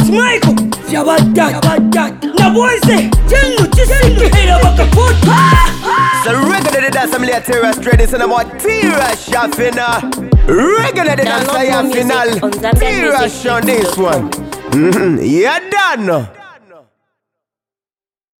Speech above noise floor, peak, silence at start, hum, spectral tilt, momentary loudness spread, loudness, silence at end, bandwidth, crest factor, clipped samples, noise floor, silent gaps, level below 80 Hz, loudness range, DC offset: over 80 dB; 0 dBFS; 0 s; none; -5 dB/octave; 6 LU; -11 LUFS; 1.9 s; 18.5 kHz; 10 dB; under 0.1%; under -90 dBFS; none; -18 dBFS; 4 LU; under 0.1%